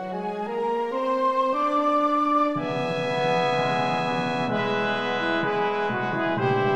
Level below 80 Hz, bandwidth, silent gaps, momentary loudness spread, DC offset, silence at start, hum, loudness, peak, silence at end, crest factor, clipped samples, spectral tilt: -62 dBFS; 10.5 kHz; none; 5 LU; under 0.1%; 0 s; none; -24 LUFS; -10 dBFS; 0 s; 14 dB; under 0.1%; -6 dB/octave